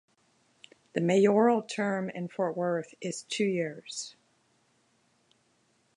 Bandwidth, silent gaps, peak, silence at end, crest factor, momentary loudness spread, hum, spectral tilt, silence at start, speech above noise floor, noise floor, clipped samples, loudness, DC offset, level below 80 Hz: 11 kHz; none; -12 dBFS; 1.85 s; 20 dB; 15 LU; none; -5.5 dB/octave; 0.95 s; 42 dB; -70 dBFS; under 0.1%; -29 LUFS; under 0.1%; -82 dBFS